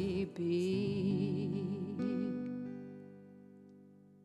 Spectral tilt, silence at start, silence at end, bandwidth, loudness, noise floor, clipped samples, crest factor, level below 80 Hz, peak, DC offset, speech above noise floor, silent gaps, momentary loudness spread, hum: -8 dB/octave; 0 s; 0.3 s; 10.5 kHz; -37 LUFS; -60 dBFS; under 0.1%; 12 dB; -68 dBFS; -24 dBFS; under 0.1%; 25 dB; none; 21 LU; 50 Hz at -55 dBFS